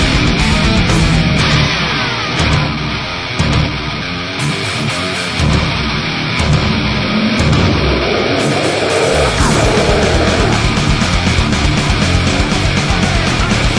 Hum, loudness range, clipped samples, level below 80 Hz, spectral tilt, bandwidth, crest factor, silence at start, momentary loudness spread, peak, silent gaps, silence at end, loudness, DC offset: none; 3 LU; under 0.1%; -22 dBFS; -5 dB/octave; 10.5 kHz; 12 dB; 0 s; 5 LU; 0 dBFS; none; 0 s; -13 LUFS; under 0.1%